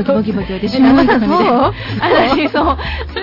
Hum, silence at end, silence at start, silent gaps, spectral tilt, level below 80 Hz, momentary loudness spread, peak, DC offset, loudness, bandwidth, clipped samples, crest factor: none; 0 s; 0 s; none; -7.5 dB/octave; -30 dBFS; 9 LU; -2 dBFS; under 0.1%; -13 LUFS; 5.8 kHz; under 0.1%; 10 dB